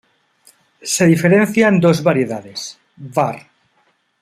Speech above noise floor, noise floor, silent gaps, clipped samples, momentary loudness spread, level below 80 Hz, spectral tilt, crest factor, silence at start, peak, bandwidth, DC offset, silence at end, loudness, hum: 46 dB; -61 dBFS; none; under 0.1%; 19 LU; -58 dBFS; -5.5 dB/octave; 16 dB; 0.85 s; -2 dBFS; 15 kHz; under 0.1%; 0.8 s; -15 LUFS; none